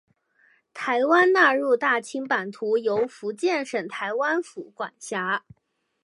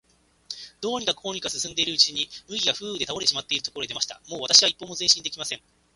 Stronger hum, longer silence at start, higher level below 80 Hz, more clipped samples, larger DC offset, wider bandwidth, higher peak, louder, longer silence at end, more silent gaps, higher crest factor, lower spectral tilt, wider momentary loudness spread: neither; first, 0.75 s vs 0.5 s; second, -76 dBFS vs -62 dBFS; neither; neither; about the same, 11.5 kHz vs 11.5 kHz; about the same, -4 dBFS vs -2 dBFS; about the same, -23 LUFS vs -23 LUFS; first, 0.65 s vs 0.4 s; neither; second, 20 dB vs 26 dB; first, -4 dB/octave vs -0.5 dB/octave; about the same, 14 LU vs 16 LU